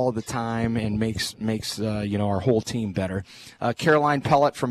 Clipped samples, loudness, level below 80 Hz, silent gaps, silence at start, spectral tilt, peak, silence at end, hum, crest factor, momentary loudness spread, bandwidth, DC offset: under 0.1%; -24 LUFS; -50 dBFS; none; 0 s; -5.5 dB/octave; -6 dBFS; 0 s; none; 18 dB; 8 LU; 14 kHz; under 0.1%